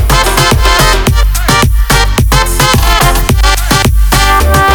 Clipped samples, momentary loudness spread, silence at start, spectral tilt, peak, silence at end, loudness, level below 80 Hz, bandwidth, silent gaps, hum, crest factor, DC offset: 0.3%; 2 LU; 0 s; -3.5 dB/octave; 0 dBFS; 0 s; -8 LUFS; -10 dBFS; over 20 kHz; none; none; 6 dB; under 0.1%